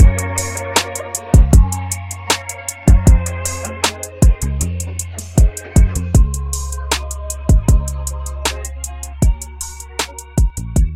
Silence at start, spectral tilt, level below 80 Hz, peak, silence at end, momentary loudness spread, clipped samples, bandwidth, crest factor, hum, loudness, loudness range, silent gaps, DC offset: 0 s; -4.5 dB/octave; -16 dBFS; 0 dBFS; 0 s; 12 LU; under 0.1%; 16.5 kHz; 14 dB; none; -17 LUFS; 4 LU; none; under 0.1%